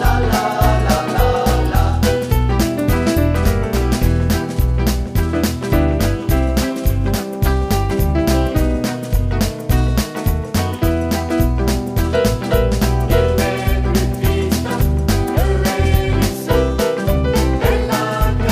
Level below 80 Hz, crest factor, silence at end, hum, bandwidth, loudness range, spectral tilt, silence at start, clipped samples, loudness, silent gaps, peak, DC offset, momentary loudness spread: -20 dBFS; 14 dB; 0 s; none; 15.5 kHz; 2 LU; -6 dB/octave; 0 s; under 0.1%; -17 LUFS; none; -2 dBFS; under 0.1%; 3 LU